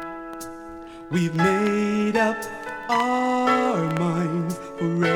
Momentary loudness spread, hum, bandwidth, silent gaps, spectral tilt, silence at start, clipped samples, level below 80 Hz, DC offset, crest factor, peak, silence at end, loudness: 15 LU; none; 16.5 kHz; none; -6 dB/octave; 0 s; under 0.1%; -56 dBFS; under 0.1%; 16 dB; -8 dBFS; 0 s; -23 LUFS